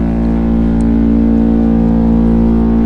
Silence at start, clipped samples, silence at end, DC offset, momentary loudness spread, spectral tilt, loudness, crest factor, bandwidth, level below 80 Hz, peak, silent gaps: 0 s; under 0.1%; 0 s; under 0.1%; 2 LU; -10.5 dB/octave; -11 LUFS; 8 dB; 4.4 kHz; -18 dBFS; -2 dBFS; none